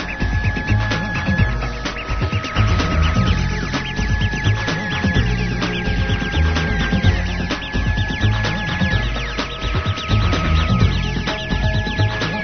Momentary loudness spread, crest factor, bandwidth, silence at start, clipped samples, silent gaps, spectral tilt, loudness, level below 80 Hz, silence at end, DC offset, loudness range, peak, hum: 5 LU; 16 dB; 6.6 kHz; 0 s; under 0.1%; none; -6 dB/octave; -19 LUFS; -24 dBFS; 0 s; under 0.1%; 1 LU; -2 dBFS; none